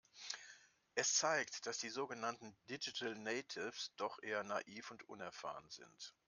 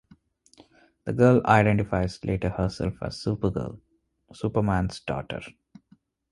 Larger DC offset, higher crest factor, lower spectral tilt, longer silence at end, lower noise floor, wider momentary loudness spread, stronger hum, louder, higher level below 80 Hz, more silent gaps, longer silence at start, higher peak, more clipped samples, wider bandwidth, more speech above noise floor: neither; about the same, 22 dB vs 22 dB; second, -1 dB/octave vs -7.5 dB/octave; second, 0.15 s vs 0.8 s; about the same, -65 dBFS vs -62 dBFS; about the same, 17 LU vs 16 LU; neither; second, -43 LUFS vs -25 LUFS; second, -90 dBFS vs -44 dBFS; neither; second, 0.15 s vs 1.05 s; second, -22 dBFS vs -4 dBFS; neither; about the same, 11 kHz vs 11.5 kHz; second, 21 dB vs 37 dB